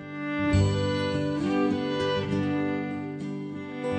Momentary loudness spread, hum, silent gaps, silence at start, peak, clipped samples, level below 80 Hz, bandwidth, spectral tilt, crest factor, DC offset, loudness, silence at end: 10 LU; 50 Hz at -50 dBFS; none; 0 s; -10 dBFS; under 0.1%; -48 dBFS; 9.2 kHz; -7 dB/octave; 18 dB; under 0.1%; -28 LUFS; 0 s